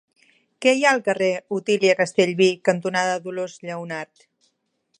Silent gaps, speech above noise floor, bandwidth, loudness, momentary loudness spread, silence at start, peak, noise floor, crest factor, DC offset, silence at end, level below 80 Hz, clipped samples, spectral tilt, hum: none; 49 dB; 11 kHz; -21 LUFS; 13 LU; 0.6 s; -2 dBFS; -70 dBFS; 20 dB; under 0.1%; 0.95 s; -74 dBFS; under 0.1%; -4 dB/octave; none